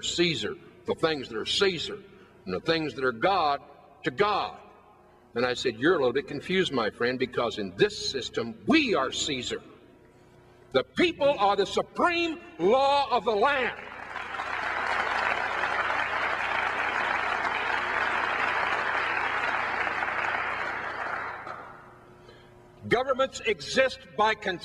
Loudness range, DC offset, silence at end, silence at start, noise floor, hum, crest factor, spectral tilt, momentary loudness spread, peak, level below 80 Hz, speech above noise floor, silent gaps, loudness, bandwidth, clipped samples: 4 LU; under 0.1%; 0 s; 0 s; -56 dBFS; none; 20 dB; -3.5 dB/octave; 10 LU; -8 dBFS; -60 dBFS; 29 dB; none; -27 LUFS; 12 kHz; under 0.1%